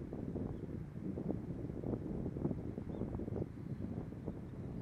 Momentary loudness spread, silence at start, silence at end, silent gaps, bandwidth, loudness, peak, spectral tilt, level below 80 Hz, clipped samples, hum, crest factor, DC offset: 5 LU; 0 s; 0 s; none; 10.5 kHz; -43 LUFS; -22 dBFS; -10.5 dB/octave; -54 dBFS; under 0.1%; none; 20 dB; under 0.1%